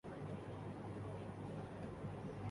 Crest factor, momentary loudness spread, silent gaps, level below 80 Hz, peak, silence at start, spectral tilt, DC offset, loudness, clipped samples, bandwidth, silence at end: 12 dB; 1 LU; none; -64 dBFS; -36 dBFS; 0.05 s; -8 dB/octave; under 0.1%; -49 LUFS; under 0.1%; 11.5 kHz; 0 s